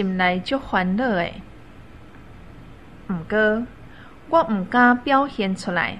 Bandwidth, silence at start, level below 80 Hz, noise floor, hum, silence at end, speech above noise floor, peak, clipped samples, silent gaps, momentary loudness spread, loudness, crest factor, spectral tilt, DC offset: 10.5 kHz; 0 s; -48 dBFS; -44 dBFS; none; 0 s; 23 dB; -4 dBFS; under 0.1%; none; 14 LU; -21 LUFS; 18 dB; -6.5 dB/octave; 0.4%